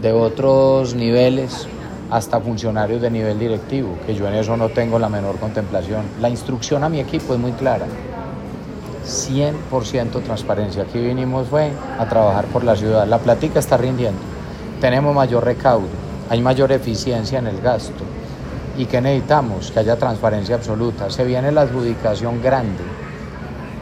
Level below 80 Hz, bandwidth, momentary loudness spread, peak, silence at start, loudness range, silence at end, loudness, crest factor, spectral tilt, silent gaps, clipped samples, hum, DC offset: -38 dBFS; 15.5 kHz; 13 LU; 0 dBFS; 0 s; 5 LU; 0 s; -19 LUFS; 18 dB; -6.5 dB/octave; none; under 0.1%; none; under 0.1%